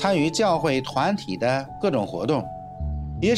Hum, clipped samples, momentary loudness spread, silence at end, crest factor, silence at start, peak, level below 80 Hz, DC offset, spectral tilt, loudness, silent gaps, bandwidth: none; under 0.1%; 10 LU; 0 s; 16 dB; 0 s; -8 dBFS; -40 dBFS; under 0.1%; -5.5 dB/octave; -24 LUFS; none; 13.5 kHz